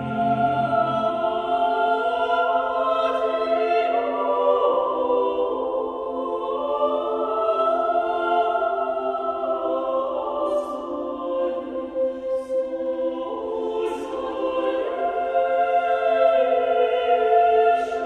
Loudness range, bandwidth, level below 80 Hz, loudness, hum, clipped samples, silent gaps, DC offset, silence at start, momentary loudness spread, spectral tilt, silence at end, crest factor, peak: 5 LU; 9.2 kHz; -58 dBFS; -22 LUFS; none; under 0.1%; none; under 0.1%; 0 s; 8 LU; -6.5 dB/octave; 0 s; 16 dB; -6 dBFS